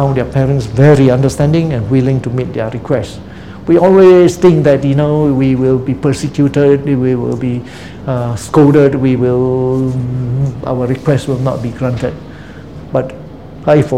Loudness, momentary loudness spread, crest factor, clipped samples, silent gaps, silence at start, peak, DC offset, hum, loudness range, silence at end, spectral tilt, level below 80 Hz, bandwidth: -12 LUFS; 16 LU; 12 dB; 0.5%; none; 0 s; 0 dBFS; 0.8%; none; 6 LU; 0 s; -8 dB/octave; -36 dBFS; 11.5 kHz